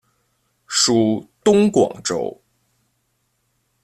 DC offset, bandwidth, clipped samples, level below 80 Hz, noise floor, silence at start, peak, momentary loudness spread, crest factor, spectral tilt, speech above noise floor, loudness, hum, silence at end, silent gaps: under 0.1%; 13.5 kHz; under 0.1%; -58 dBFS; -69 dBFS; 0.7 s; -2 dBFS; 9 LU; 18 dB; -4 dB/octave; 52 dB; -18 LUFS; none; 1.5 s; none